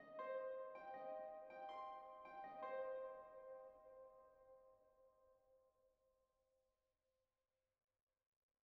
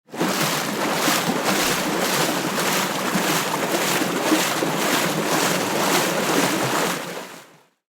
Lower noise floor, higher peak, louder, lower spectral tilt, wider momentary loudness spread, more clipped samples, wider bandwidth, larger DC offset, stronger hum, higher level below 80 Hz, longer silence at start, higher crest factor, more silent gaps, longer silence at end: first, under -90 dBFS vs -49 dBFS; second, -40 dBFS vs -6 dBFS; second, -54 LUFS vs -21 LUFS; about the same, -2 dB/octave vs -3 dB/octave; first, 16 LU vs 3 LU; neither; second, 5.6 kHz vs over 20 kHz; neither; neither; second, under -90 dBFS vs -60 dBFS; about the same, 0 s vs 0.1 s; about the same, 18 dB vs 16 dB; neither; first, 2.75 s vs 0.5 s